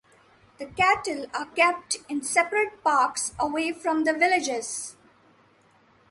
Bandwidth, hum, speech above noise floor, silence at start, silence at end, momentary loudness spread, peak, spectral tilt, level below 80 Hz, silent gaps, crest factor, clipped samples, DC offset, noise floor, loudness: 11.5 kHz; none; 35 dB; 0.6 s; 1.2 s; 10 LU; -8 dBFS; -2 dB/octave; -62 dBFS; none; 20 dB; under 0.1%; under 0.1%; -60 dBFS; -25 LUFS